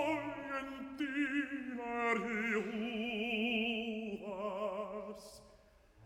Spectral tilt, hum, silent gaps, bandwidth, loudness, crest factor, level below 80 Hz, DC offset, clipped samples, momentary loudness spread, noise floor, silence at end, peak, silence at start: -5 dB/octave; none; none; 14.5 kHz; -38 LUFS; 18 dB; -68 dBFS; under 0.1%; under 0.1%; 11 LU; -64 dBFS; 0 s; -22 dBFS; 0 s